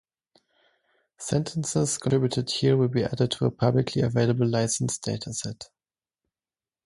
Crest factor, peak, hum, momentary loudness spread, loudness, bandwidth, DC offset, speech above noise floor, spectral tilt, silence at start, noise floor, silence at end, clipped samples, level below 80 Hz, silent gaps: 18 dB; -8 dBFS; none; 9 LU; -25 LUFS; 11.5 kHz; under 0.1%; over 65 dB; -5.5 dB/octave; 1.2 s; under -90 dBFS; 1.2 s; under 0.1%; -56 dBFS; none